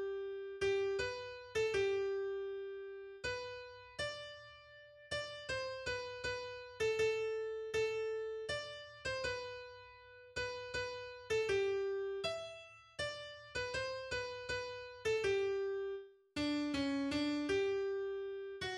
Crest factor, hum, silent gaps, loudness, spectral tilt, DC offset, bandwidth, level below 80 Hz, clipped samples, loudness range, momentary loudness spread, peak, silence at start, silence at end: 16 dB; none; none; -40 LUFS; -4 dB/octave; under 0.1%; 11.5 kHz; -64 dBFS; under 0.1%; 5 LU; 13 LU; -24 dBFS; 0 s; 0 s